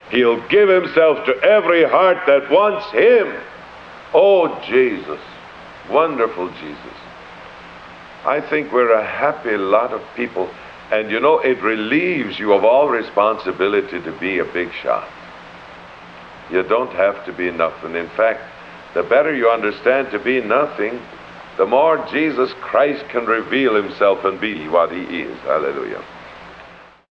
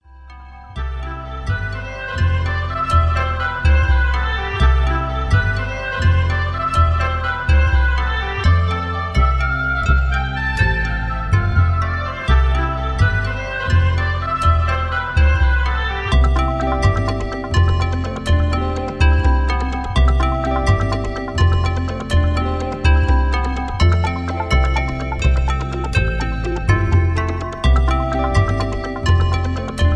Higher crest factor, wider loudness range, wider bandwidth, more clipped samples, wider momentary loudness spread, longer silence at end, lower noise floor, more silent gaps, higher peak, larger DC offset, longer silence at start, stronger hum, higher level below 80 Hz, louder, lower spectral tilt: about the same, 16 dB vs 14 dB; first, 7 LU vs 1 LU; second, 6.6 kHz vs 9.8 kHz; neither; first, 23 LU vs 6 LU; first, 0.3 s vs 0 s; first, -42 dBFS vs -38 dBFS; neither; about the same, -2 dBFS vs -2 dBFS; neither; about the same, 0.05 s vs 0.1 s; neither; second, -56 dBFS vs -20 dBFS; about the same, -17 LUFS vs -18 LUFS; about the same, -6.5 dB/octave vs -6.5 dB/octave